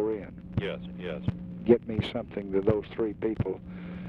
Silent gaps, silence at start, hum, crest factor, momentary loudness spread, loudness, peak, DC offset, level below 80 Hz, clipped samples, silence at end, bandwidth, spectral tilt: none; 0 s; none; 22 dB; 12 LU; -30 LUFS; -8 dBFS; under 0.1%; -50 dBFS; under 0.1%; 0 s; 5.6 kHz; -9 dB/octave